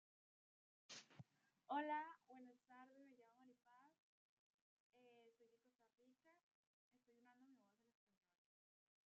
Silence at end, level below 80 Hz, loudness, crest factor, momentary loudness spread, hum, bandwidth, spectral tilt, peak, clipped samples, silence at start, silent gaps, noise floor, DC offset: 1.5 s; under -90 dBFS; -51 LUFS; 24 dB; 21 LU; none; 7 kHz; -2.5 dB/octave; -36 dBFS; under 0.1%; 0.9 s; 3.99-4.93 s, 6.43-6.91 s; -82 dBFS; under 0.1%